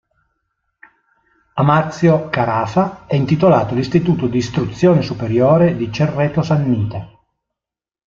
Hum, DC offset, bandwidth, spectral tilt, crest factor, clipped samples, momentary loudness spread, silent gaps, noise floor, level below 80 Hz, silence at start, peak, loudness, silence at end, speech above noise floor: none; under 0.1%; 7.4 kHz; -8 dB/octave; 14 dB; under 0.1%; 6 LU; none; -88 dBFS; -46 dBFS; 1.55 s; -2 dBFS; -16 LUFS; 1 s; 73 dB